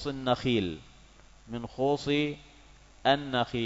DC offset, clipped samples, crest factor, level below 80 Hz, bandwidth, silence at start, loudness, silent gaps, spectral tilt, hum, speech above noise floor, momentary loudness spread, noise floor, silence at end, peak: under 0.1%; under 0.1%; 20 dB; -54 dBFS; 7.8 kHz; 0 s; -29 LUFS; none; -6 dB/octave; none; 26 dB; 14 LU; -55 dBFS; 0 s; -10 dBFS